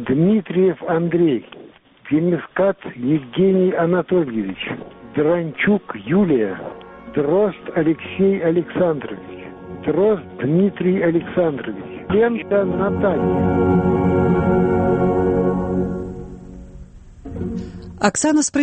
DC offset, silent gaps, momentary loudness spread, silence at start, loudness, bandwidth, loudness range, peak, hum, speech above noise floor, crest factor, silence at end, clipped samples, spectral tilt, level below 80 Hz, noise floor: under 0.1%; none; 14 LU; 0 s; -19 LUFS; 8.4 kHz; 3 LU; -2 dBFS; none; 26 dB; 18 dB; 0 s; under 0.1%; -6.5 dB/octave; -42 dBFS; -44 dBFS